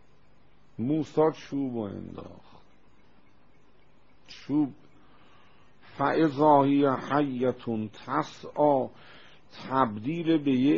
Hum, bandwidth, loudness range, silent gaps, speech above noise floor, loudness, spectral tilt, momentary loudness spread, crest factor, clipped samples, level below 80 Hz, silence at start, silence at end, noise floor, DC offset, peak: none; 7.2 kHz; 12 LU; none; 36 dB; -27 LUFS; -6 dB/octave; 19 LU; 22 dB; under 0.1%; -66 dBFS; 0.8 s; 0 s; -62 dBFS; 0.3%; -8 dBFS